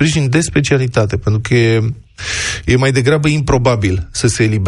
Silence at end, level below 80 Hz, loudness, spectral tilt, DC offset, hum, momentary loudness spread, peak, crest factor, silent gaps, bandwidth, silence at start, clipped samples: 0 s; -32 dBFS; -14 LUFS; -5.5 dB/octave; under 0.1%; none; 5 LU; 0 dBFS; 14 dB; none; 11.5 kHz; 0 s; under 0.1%